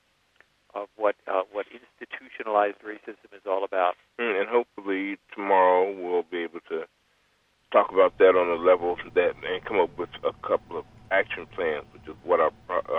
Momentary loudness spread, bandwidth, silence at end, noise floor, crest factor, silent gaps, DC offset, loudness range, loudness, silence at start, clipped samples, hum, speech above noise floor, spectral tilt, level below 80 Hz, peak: 19 LU; 4.5 kHz; 0 s; -67 dBFS; 20 dB; none; under 0.1%; 6 LU; -25 LUFS; 0.75 s; under 0.1%; none; 42 dB; -6.5 dB/octave; -62 dBFS; -6 dBFS